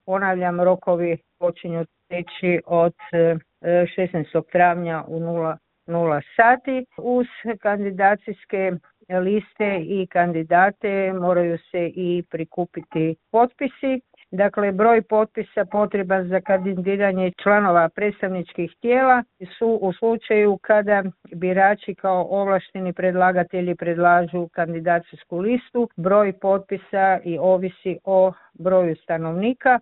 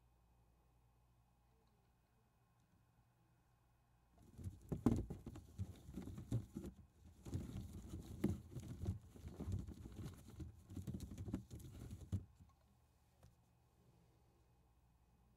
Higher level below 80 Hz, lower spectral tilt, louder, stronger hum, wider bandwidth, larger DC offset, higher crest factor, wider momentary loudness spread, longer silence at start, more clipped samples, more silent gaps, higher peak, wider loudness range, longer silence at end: about the same, -62 dBFS vs -62 dBFS; first, -11.5 dB/octave vs -8 dB/octave; first, -21 LUFS vs -49 LUFS; neither; second, 4.1 kHz vs 16 kHz; neither; second, 20 dB vs 30 dB; about the same, 10 LU vs 12 LU; second, 0.05 s vs 0.4 s; neither; neither; first, 0 dBFS vs -22 dBFS; second, 3 LU vs 9 LU; about the same, 0 s vs 0.05 s